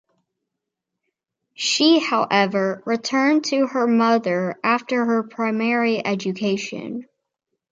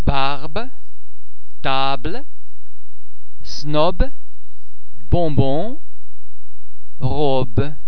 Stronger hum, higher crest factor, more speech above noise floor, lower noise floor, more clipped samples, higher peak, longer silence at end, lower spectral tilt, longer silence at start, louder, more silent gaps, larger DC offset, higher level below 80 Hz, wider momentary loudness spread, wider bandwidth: neither; second, 18 dB vs 24 dB; first, 62 dB vs 39 dB; first, -82 dBFS vs -55 dBFS; neither; second, -4 dBFS vs 0 dBFS; first, 0.7 s vs 0 s; second, -4 dB/octave vs -7 dB/octave; first, 1.6 s vs 0 s; about the same, -20 LUFS vs -22 LUFS; neither; second, under 0.1% vs 40%; second, -72 dBFS vs -30 dBFS; second, 8 LU vs 12 LU; first, 9 kHz vs 5.4 kHz